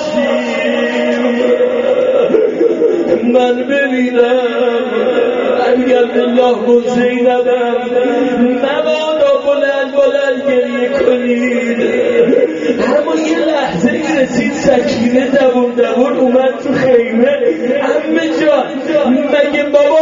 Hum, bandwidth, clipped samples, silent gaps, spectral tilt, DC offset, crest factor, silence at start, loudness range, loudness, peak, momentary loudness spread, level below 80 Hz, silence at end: none; 7.6 kHz; under 0.1%; none; -3.5 dB/octave; under 0.1%; 12 dB; 0 s; 1 LU; -12 LUFS; 0 dBFS; 3 LU; -50 dBFS; 0 s